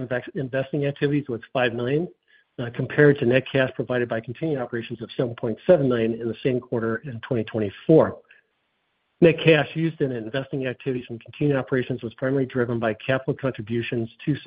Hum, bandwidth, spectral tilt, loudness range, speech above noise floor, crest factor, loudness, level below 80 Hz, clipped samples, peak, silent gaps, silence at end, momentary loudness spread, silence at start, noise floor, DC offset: none; 5 kHz; -11.5 dB/octave; 4 LU; 49 dB; 22 dB; -24 LUFS; -58 dBFS; under 0.1%; -2 dBFS; none; 0 s; 11 LU; 0 s; -72 dBFS; under 0.1%